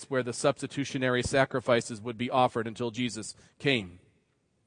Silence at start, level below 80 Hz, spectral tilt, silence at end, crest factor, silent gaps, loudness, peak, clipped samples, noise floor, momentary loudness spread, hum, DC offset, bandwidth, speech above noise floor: 0 s; -60 dBFS; -4.5 dB/octave; 0.7 s; 22 dB; none; -29 LUFS; -8 dBFS; under 0.1%; -72 dBFS; 9 LU; none; under 0.1%; 10.5 kHz; 42 dB